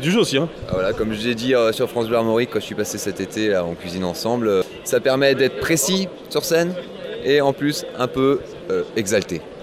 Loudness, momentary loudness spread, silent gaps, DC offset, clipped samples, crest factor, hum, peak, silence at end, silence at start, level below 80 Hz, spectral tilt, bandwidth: -20 LUFS; 8 LU; none; under 0.1%; under 0.1%; 18 dB; none; -2 dBFS; 0 s; 0 s; -48 dBFS; -4 dB/octave; 16 kHz